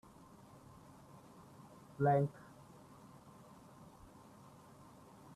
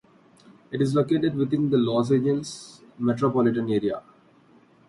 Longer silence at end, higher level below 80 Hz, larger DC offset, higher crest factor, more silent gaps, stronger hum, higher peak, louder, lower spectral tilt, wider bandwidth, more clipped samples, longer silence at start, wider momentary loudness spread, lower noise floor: first, 3.05 s vs 0.9 s; second, -74 dBFS vs -62 dBFS; neither; first, 22 dB vs 16 dB; neither; neither; second, -22 dBFS vs -10 dBFS; second, -35 LUFS vs -24 LUFS; about the same, -8.5 dB/octave vs -7.5 dB/octave; first, 13.5 kHz vs 11.5 kHz; neither; first, 2 s vs 0.7 s; first, 25 LU vs 14 LU; first, -60 dBFS vs -56 dBFS